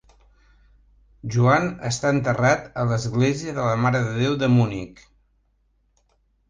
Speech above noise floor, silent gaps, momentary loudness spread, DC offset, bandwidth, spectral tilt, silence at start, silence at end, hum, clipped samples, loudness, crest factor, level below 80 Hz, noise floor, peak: 45 dB; none; 7 LU; under 0.1%; 9.6 kHz; -6 dB/octave; 1.25 s; 1.6 s; none; under 0.1%; -21 LUFS; 20 dB; -50 dBFS; -65 dBFS; -4 dBFS